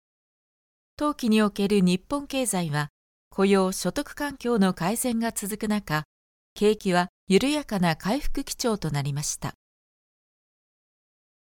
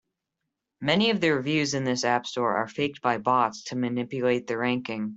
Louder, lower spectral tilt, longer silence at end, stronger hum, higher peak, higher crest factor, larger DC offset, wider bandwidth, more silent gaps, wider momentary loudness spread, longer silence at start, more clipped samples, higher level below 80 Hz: about the same, -25 LUFS vs -26 LUFS; about the same, -5 dB/octave vs -4.5 dB/octave; first, 2.05 s vs 0 s; neither; about the same, -6 dBFS vs -6 dBFS; about the same, 20 dB vs 20 dB; neither; first, 18 kHz vs 8.2 kHz; first, 2.90-3.31 s, 6.05-6.56 s, 7.09-7.27 s vs none; about the same, 8 LU vs 7 LU; first, 1 s vs 0.8 s; neither; first, -44 dBFS vs -66 dBFS